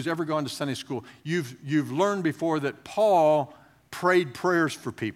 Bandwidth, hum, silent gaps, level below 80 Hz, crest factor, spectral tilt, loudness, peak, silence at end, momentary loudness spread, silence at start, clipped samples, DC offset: 16 kHz; none; none; -72 dBFS; 18 dB; -5.5 dB/octave; -26 LUFS; -8 dBFS; 0 s; 11 LU; 0 s; under 0.1%; under 0.1%